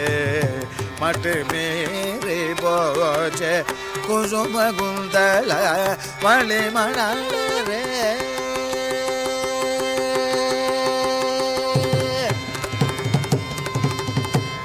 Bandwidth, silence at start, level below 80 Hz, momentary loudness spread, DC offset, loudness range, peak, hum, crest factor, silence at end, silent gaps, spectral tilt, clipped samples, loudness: 16 kHz; 0 s; -48 dBFS; 6 LU; under 0.1%; 3 LU; -4 dBFS; none; 18 dB; 0 s; none; -4 dB/octave; under 0.1%; -21 LUFS